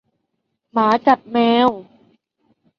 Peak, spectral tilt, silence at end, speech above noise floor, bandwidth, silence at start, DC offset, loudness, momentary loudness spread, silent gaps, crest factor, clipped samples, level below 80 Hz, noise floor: -2 dBFS; -6 dB/octave; 0.95 s; 58 dB; 6.8 kHz; 0.75 s; under 0.1%; -17 LUFS; 9 LU; none; 18 dB; under 0.1%; -62 dBFS; -74 dBFS